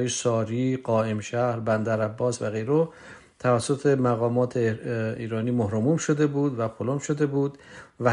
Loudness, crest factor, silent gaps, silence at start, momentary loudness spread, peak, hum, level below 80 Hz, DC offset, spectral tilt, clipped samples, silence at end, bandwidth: -25 LUFS; 18 dB; none; 0 s; 6 LU; -6 dBFS; none; -62 dBFS; under 0.1%; -6 dB/octave; under 0.1%; 0 s; 11 kHz